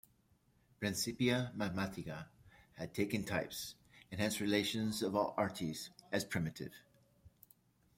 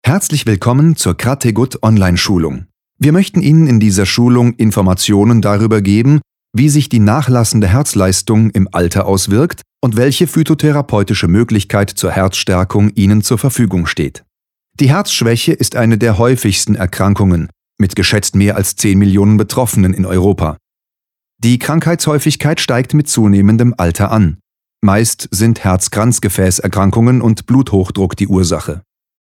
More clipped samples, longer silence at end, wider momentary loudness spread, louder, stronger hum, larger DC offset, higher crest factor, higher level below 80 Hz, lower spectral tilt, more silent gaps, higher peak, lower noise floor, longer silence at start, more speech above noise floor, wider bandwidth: neither; first, 0.7 s vs 0.45 s; first, 15 LU vs 5 LU; second, -38 LUFS vs -12 LUFS; neither; neither; first, 22 dB vs 12 dB; second, -70 dBFS vs -36 dBFS; about the same, -4.5 dB/octave vs -5.5 dB/octave; neither; second, -18 dBFS vs 0 dBFS; second, -73 dBFS vs -86 dBFS; first, 0.8 s vs 0.05 s; second, 35 dB vs 75 dB; about the same, 16.5 kHz vs 17 kHz